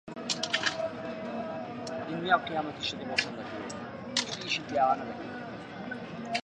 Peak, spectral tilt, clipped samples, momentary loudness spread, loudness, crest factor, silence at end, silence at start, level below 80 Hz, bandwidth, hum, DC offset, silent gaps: -10 dBFS; -3 dB/octave; under 0.1%; 12 LU; -32 LUFS; 24 dB; 0.05 s; 0.05 s; -66 dBFS; 11.5 kHz; none; under 0.1%; none